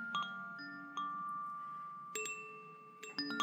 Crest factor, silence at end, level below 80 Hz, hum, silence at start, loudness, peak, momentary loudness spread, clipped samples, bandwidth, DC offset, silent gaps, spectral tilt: 20 dB; 0 s; under -90 dBFS; none; 0 s; -44 LUFS; -24 dBFS; 10 LU; under 0.1%; over 20 kHz; under 0.1%; none; -2 dB/octave